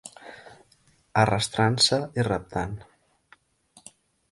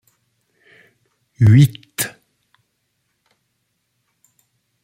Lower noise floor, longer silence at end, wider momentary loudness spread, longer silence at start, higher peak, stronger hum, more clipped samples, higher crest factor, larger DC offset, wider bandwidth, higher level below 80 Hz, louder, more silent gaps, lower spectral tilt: second, -63 dBFS vs -71 dBFS; second, 1.5 s vs 2.75 s; first, 22 LU vs 13 LU; second, 0.05 s vs 1.4 s; second, -8 dBFS vs -2 dBFS; neither; neither; about the same, 20 dB vs 18 dB; neither; second, 11.5 kHz vs 16.5 kHz; about the same, -52 dBFS vs -52 dBFS; second, -24 LUFS vs -15 LUFS; neither; second, -4 dB/octave vs -6 dB/octave